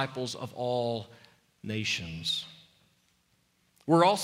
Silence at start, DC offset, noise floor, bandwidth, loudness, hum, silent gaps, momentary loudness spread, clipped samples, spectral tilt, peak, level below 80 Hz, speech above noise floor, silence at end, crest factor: 0 s; under 0.1%; -71 dBFS; 16 kHz; -30 LUFS; none; none; 20 LU; under 0.1%; -4.5 dB/octave; -10 dBFS; -66 dBFS; 42 dB; 0 s; 22 dB